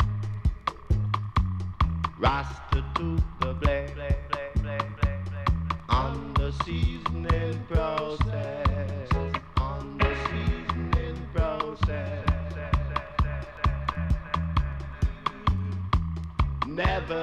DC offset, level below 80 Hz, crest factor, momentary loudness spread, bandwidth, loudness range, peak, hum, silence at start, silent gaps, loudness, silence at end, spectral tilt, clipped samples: under 0.1%; -32 dBFS; 20 dB; 4 LU; 8.2 kHz; 1 LU; -8 dBFS; none; 0 s; none; -29 LUFS; 0 s; -7.5 dB/octave; under 0.1%